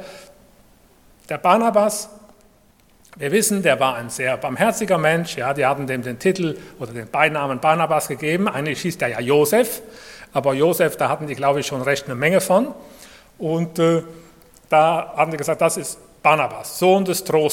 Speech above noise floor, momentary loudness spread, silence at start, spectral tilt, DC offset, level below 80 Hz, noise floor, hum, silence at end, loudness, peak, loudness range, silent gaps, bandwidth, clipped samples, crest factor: 35 dB; 12 LU; 0 s; -4.5 dB/octave; under 0.1%; -58 dBFS; -55 dBFS; none; 0 s; -19 LUFS; 0 dBFS; 2 LU; none; 17.5 kHz; under 0.1%; 20 dB